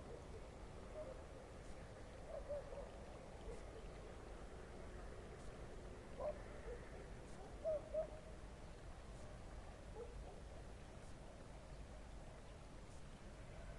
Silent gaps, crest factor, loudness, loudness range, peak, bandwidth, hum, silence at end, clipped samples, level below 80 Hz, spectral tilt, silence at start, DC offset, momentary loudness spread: none; 18 dB; -54 LUFS; 7 LU; -34 dBFS; 11.5 kHz; none; 0 s; under 0.1%; -58 dBFS; -6 dB/octave; 0 s; under 0.1%; 9 LU